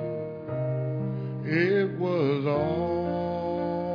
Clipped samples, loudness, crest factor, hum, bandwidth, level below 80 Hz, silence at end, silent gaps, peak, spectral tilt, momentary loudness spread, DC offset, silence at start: under 0.1%; -28 LUFS; 16 dB; none; 5.4 kHz; -58 dBFS; 0 s; none; -12 dBFS; -9.5 dB/octave; 8 LU; under 0.1%; 0 s